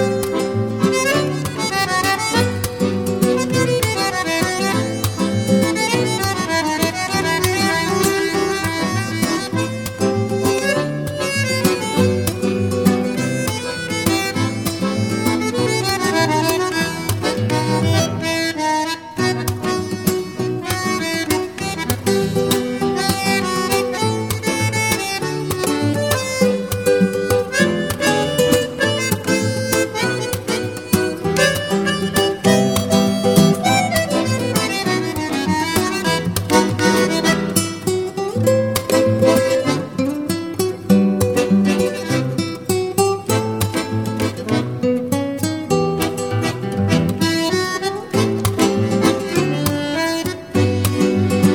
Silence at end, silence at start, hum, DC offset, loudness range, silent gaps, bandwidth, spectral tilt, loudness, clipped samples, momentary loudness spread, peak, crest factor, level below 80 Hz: 0 s; 0 s; none; 0.2%; 3 LU; none; 19.5 kHz; -4.5 dB/octave; -18 LUFS; under 0.1%; 5 LU; 0 dBFS; 18 dB; -46 dBFS